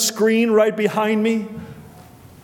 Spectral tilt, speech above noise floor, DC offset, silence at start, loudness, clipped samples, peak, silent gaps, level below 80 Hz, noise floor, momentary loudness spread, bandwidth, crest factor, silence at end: -4 dB/octave; 26 dB; under 0.1%; 0 s; -18 LUFS; under 0.1%; -4 dBFS; none; -58 dBFS; -43 dBFS; 18 LU; 19 kHz; 16 dB; 0.45 s